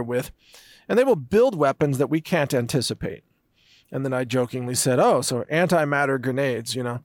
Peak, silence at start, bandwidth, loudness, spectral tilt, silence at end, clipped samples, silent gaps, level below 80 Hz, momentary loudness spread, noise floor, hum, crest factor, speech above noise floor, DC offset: -10 dBFS; 0 s; 18 kHz; -22 LUFS; -5 dB/octave; 0.05 s; under 0.1%; none; -56 dBFS; 10 LU; -60 dBFS; none; 14 dB; 38 dB; under 0.1%